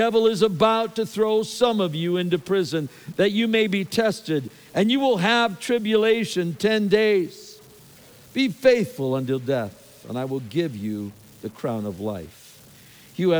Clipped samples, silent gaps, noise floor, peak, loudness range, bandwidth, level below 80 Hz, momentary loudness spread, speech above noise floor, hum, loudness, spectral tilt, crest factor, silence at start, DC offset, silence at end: under 0.1%; none; -49 dBFS; -4 dBFS; 7 LU; over 20 kHz; -62 dBFS; 13 LU; 27 dB; none; -23 LUFS; -5.5 dB/octave; 18 dB; 0 s; under 0.1%; 0 s